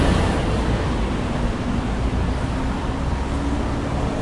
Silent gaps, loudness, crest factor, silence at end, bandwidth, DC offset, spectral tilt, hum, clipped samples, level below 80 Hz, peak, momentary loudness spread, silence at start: none; -23 LUFS; 14 dB; 0 s; 11.5 kHz; under 0.1%; -6.5 dB/octave; none; under 0.1%; -26 dBFS; -6 dBFS; 4 LU; 0 s